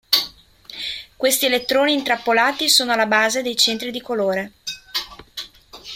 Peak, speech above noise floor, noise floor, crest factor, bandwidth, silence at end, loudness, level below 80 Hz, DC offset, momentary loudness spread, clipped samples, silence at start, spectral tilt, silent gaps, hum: -2 dBFS; 24 dB; -42 dBFS; 20 dB; 16.5 kHz; 0 s; -18 LUFS; -58 dBFS; under 0.1%; 18 LU; under 0.1%; 0.1 s; -1 dB/octave; none; none